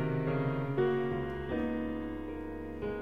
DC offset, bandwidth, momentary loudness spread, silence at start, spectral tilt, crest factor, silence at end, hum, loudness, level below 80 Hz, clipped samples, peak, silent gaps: 0.3%; 5.6 kHz; 9 LU; 0 s; -9.5 dB/octave; 14 dB; 0 s; none; -34 LUFS; -50 dBFS; under 0.1%; -20 dBFS; none